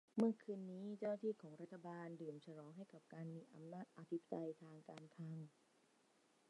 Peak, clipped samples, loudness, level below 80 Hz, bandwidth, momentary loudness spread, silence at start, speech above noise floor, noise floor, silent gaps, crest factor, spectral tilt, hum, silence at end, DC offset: -26 dBFS; under 0.1%; -50 LUFS; under -90 dBFS; 11 kHz; 15 LU; 0.15 s; 29 dB; -77 dBFS; none; 24 dB; -8.5 dB/octave; none; 1 s; under 0.1%